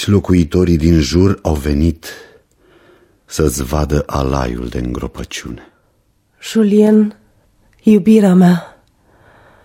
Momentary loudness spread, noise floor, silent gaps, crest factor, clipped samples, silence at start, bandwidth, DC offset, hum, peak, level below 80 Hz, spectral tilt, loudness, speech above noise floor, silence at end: 16 LU; -58 dBFS; none; 14 dB; under 0.1%; 0 s; 16 kHz; under 0.1%; none; 0 dBFS; -28 dBFS; -7 dB/octave; -14 LUFS; 45 dB; 0.95 s